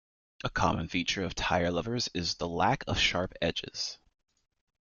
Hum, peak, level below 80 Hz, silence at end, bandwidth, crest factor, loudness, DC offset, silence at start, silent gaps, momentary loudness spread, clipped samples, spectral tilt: none; -12 dBFS; -50 dBFS; 0.85 s; 7.4 kHz; 20 dB; -30 LUFS; under 0.1%; 0.45 s; none; 9 LU; under 0.1%; -4 dB/octave